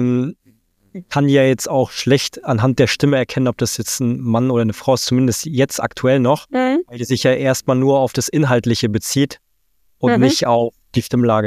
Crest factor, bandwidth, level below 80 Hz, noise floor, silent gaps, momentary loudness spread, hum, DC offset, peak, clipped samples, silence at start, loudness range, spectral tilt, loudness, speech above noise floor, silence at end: 16 dB; 15.5 kHz; -50 dBFS; -65 dBFS; none; 6 LU; none; under 0.1%; 0 dBFS; under 0.1%; 0 s; 1 LU; -5.5 dB/octave; -17 LUFS; 49 dB; 0 s